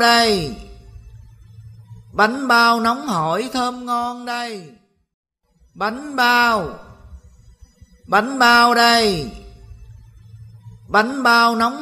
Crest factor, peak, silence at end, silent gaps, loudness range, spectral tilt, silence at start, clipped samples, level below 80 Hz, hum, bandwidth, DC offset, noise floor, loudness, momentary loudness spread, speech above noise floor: 18 dB; -2 dBFS; 0 s; 5.14-5.23 s; 5 LU; -3.5 dB/octave; 0 s; under 0.1%; -46 dBFS; none; 16 kHz; under 0.1%; -58 dBFS; -16 LUFS; 14 LU; 42 dB